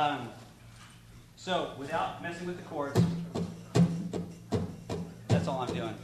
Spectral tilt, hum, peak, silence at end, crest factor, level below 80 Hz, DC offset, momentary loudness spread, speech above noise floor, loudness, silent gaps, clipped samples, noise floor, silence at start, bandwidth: -6.5 dB/octave; none; -12 dBFS; 0 s; 22 dB; -60 dBFS; under 0.1%; 22 LU; 20 dB; -33 LUFS; none; under 0.1%; -53 dBFS; 0 s; 13.5 kHz